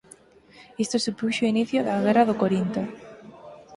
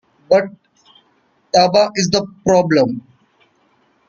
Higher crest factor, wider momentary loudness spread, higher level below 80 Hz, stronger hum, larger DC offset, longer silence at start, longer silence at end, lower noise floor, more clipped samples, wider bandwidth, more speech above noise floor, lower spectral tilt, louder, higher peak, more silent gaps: about the same, 18 dB vs 16 dB; first, 24 LU vs 7 LU; second, -64 dBFS vs -52 dBFS; neither; neither; first, 0.6 s vs 0.3 s; second, 0 s vs 1.1 s; second, -52 dBFS vs -59 dBFS; neither; first, 11.5 kHz vs 7.8 kHz; second, 29 dB vs 45 dB; about the same, -5.5 dB/octave vs -4.5 dB/octave; second, -24 LUFS vs -15 LUFS; second, -6 dBFS vs -2 dBFS; neither